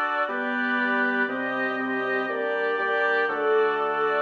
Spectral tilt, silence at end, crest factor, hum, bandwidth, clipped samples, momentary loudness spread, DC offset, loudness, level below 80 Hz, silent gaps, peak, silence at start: -5.5 dB/octave; 0 s; 12 dB; none; 6.6 kHz; under 0.1%; 4 LU; under 0.1%; -24 LUFS; -72 dBFS; none; -12 dBFS; 0 s